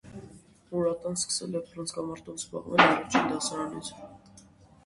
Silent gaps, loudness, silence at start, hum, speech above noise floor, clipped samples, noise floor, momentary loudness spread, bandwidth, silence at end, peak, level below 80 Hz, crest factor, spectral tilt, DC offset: none; -28 LUFS; 0.05 s; none; 27 dB; under 0.1%; -55 dBFS; 21 LU; 11.5 kHz; 0.7 s; -6 dBFS; -62 dBFS; 26 dB; -3 dB/octave; under 0.1%